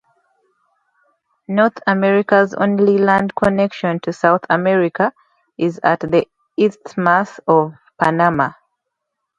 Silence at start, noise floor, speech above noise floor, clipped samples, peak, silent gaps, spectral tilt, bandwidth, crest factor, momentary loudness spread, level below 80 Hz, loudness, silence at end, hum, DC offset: 1.5 s; -77 dBFS; 61 dB; under 0.1%; 0 dBFS; none; -7.5 dB/octave; 8 kHz; 18 dB; 7 LU; -54 dBFS; -16 LUFS; 0.85 s; none; under 0.1%